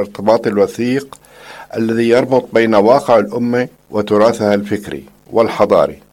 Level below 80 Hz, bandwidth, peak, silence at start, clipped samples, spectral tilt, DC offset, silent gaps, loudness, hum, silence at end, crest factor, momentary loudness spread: -52 dBFS; 16.5 kHz; 0 dBFS; 0 s; 0.1%; -6.5 dB/octave; under 0.1%; none; -14 LUFS; none; 0.2 s; 14 dB; 11 LU